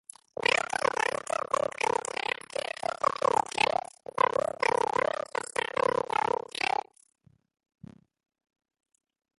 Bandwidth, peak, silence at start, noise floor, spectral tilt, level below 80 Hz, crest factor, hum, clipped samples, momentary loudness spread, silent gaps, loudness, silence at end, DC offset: 12 kHz; -10 dBFS; 0.4 s; -66 dBFS; -2 dB/octave; -68 dBFS; 22 dB; none; under 0.1%; 7 LU; none; -29 LUFS; 2.7 s; under 0.1%